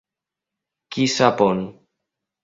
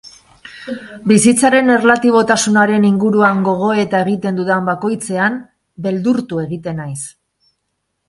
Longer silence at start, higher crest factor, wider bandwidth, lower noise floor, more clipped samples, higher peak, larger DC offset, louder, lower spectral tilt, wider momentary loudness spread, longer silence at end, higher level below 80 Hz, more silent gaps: first, 0.9 s vs 0.05 s; first, 22 dB vs 14 dB; second, 7.8 kHz vs 11.5 kHz; first, -87 dBFS vs -71 dBFS; neither; about the same, 0 dBFS vs 0 dBFS; neither; second, -19 LUFS vs -14 LUFS; about the same, -4.5 dB/octave vs -5 dB/octave; about the same, 15 LU vs 16 LU; second, 0.7 s vs 1 s; about the same, -60 dBFS vs -56 dBFS; neither